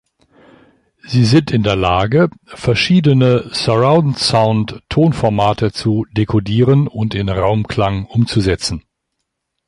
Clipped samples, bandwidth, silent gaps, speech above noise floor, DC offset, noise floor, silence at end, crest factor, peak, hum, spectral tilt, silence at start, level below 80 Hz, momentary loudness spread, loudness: under 0.1%; 11.5 kHz; none; 60 dB; under 0.1%; -74 dBFS; 0.9 s; 14 dB; 0 dBFS; none; -6.5 dB/octave; 1.05 s; -36 dBFS; 7 LU; -15 LUFS